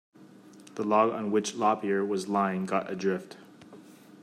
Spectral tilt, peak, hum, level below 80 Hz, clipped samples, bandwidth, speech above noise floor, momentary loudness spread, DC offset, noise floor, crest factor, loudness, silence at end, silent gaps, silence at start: -5.5 dB/octave; -10 dBFS; none; -78 dBFS; under 0.1%; 13.5 kHz; 24 dB; 12 LU; under 0.1%; -52 dBFS; 20 dB; -28 LUFS; 0 s; none; 0.2 s